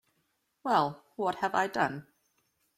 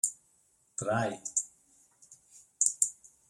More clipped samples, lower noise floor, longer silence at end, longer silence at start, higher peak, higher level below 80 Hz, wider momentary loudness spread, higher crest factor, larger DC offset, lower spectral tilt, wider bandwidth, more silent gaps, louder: neither; first, -77 dBFS vs -69 dBFS; first, 0.75 s vs 0.35 s; first, 0.65 s vs 0.05 s; second, -12 dBFS vs -8 dBFS; about the same, -74 dBFS vs -74 dBFS; second, 9 LU vs 13 LU; second, 20 dB vs 28 dB; neither; first, -5 dB/octave vs -3 dB/octave; about the same, 15.5 kHz vs 16 kHz; neither; about the same, -31 LUFS vs -31 LUFS